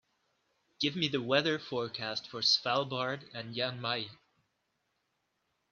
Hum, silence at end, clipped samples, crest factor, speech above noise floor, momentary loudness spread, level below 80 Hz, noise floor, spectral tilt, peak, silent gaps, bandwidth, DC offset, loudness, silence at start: none; 1.6 s; under 0.1%; 22 dB; 47 dB; 9 LU; -78 dBFS; -80 dBFS; -4 dB/octave; -14 dBFS; none; 7.6 kHz; under 0.1%; -32 LUFS; 0.8 s